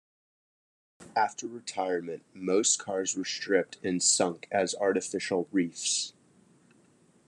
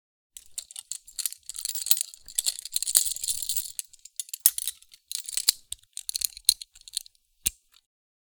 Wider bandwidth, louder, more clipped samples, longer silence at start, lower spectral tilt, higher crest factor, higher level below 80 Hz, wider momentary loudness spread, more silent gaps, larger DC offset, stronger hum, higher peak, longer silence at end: second, 12 kHz vs over 20 kHz; about the same, -29 LUFS vs -27 LUFS; neither; first, 1 s vs 0.5 s; first, -2.5 dB/octave vs 3.5 dB/octave; second, 22 dB vs 30 dB; second, -82 dBFS vs -60 dBFS; second, 10 LU vs 15 LU; neither; neither; neither; second, -10 dBFS vs 0 dBFS; first, 1.15 s vs 0.7 s